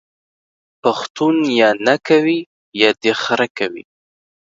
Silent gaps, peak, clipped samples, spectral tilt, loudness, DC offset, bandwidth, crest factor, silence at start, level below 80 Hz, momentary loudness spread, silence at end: 1.10-1.15 s, 2.46-2.72 s, 3.50-3.55 s; 0 dBFS; under 0.1%; -4.5 dB/octave; -16 LUFS; under 0.1%; 7.8 kHz; 18 dB; 0.85 s; -68 dBFS; 10 LU; 0.7 s